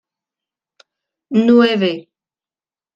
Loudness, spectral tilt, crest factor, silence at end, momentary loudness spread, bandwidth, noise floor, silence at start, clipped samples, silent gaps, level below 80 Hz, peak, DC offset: -14 LUFS; -7 dB/octave; 16 dB; 0.95 s; 10 LU; 7.2 kHz; under -90 dBFS; 1.3 s; under 0.1%; none; -66 dBFS; -2 dBFS; under 0.1%